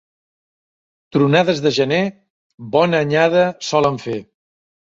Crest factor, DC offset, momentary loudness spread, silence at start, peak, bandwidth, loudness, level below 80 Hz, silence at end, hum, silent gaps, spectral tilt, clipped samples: 18 dB; under 0.1%; 11 LU; 1.15 s; -2 dBFS; 7.8 kHz; -17 LUFS; -58 dBFS; 0.65 s; none; 2.30-2.58 s; -5.5 dB/octave; under 0.1%